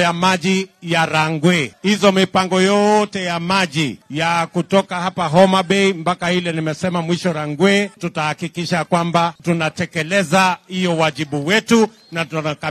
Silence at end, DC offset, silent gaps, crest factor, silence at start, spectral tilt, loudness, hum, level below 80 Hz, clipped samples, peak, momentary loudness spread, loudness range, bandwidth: 0 s; under 0.1%; none; 18 dB; 0 s; -5 dB/octave; -17 LUFS; none; -56 dBFS; under 0.1%; 0 dBFS; 8 LU; 3 LU; 13 kHz